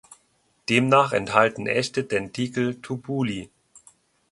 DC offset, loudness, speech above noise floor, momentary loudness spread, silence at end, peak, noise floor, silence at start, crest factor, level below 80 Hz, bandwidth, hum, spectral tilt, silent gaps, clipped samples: under 0.1%; -23 LUFS; 43 dB; 11 LU; 0.55 s; -2 dBFS; -66 dBFS; 0.7 s; 24 dB; -60 dBFS; 11.5 kHz; none; -5 dB/octave; none; under 0.1%